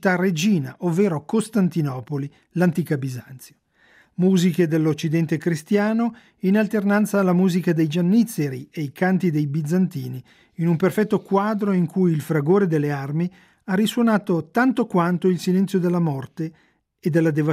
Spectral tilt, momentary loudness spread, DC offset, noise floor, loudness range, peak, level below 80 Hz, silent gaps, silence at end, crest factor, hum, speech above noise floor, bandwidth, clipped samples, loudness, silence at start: -7 dB/octave; 10 LU; under 0.1%; -56 dBFS; 3 LU; -6 dBFS; -68 dBFS; none; 0 s; 14 dB; none; 36 dB; 15.5 kHz; under 0.1%; -21 LUFS; 0 s